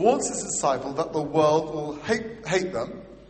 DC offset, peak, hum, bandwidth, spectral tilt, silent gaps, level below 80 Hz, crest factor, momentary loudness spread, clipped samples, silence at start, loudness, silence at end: under 0.1%; -6 dBFS; none; 8.8 kHz; -4 dB/octave; none; -54 dBFS; 20 dB; 10 LU; under 0.1%; 0 s; -25 LUFS; 0.05 s